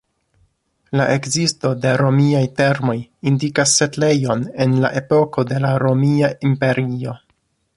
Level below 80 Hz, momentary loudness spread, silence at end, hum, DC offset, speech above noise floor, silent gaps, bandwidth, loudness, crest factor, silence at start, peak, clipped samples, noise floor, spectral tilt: -54 dBFS; 7 LU; 0.6 s; none; under 0.1%; 48 dB; none; 11.5 kHz; -17 LUFS; 16 dB; 0.9 s; -2 dBFS; under 0.1%; -65 dBFS; -5 dB/octave